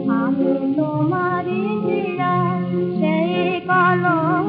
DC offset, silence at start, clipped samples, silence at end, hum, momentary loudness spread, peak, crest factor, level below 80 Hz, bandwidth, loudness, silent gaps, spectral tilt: under 0.1%; 0 s; under 0.1%; 0 s; none; 5 LU; -6 dBFS; 14 dB; -66 dBFS; 5 kHz; -19 LUFS; none; -6 dB/octave